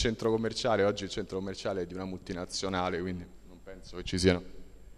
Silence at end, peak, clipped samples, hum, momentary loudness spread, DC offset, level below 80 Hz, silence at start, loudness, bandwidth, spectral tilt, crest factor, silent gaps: 0 s; -10 dBFS; under 0.1%; none; 17 LU; under 0.1%; -50 dBFS; 0 s; -32 LUFS; 13 kHz; -5 dB/octave; 22 dB; none